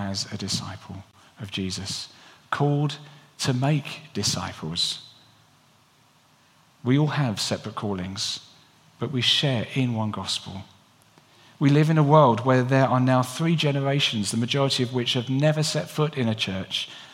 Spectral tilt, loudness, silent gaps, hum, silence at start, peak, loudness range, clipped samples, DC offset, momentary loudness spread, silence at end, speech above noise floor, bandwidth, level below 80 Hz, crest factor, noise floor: -5 dB/octave; -24 LUFS; none; none; 0 s; -2 dBFS; 8 LU; under 0.1%; under 0.1%; 13 LU; 0.05 s; 36 dB; 15 kHz; -66 dBFS; 22 dB; -59 dBFS